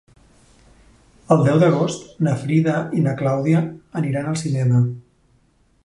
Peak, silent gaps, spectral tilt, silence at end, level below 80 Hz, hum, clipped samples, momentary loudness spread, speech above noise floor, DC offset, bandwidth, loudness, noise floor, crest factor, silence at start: -2 dBFS; none; -7.5 dB/octave; 0.85 s; -56 dBFS; none; under 0.1%; 8 LU; 40 dB; under 0.1%; 11.5 kHz; -19 LUFS; -59 dBFS; 18 dB; 1.3 s